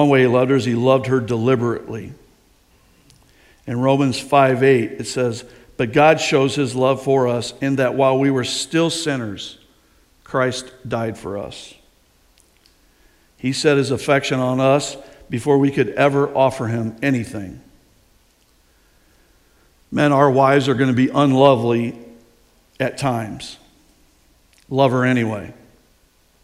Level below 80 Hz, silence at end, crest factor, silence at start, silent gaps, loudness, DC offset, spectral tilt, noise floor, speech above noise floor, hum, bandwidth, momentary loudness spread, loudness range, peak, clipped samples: -54 dBFS; 0.9 s; 20 dB; 0 s; none; -18 LUFS; under 0.1%; -6 dB/octave; -57 dBFS; 40 dB; none; 13.5 kHz; 16 LU; 10 LU; 0 dBFS; under 0.1%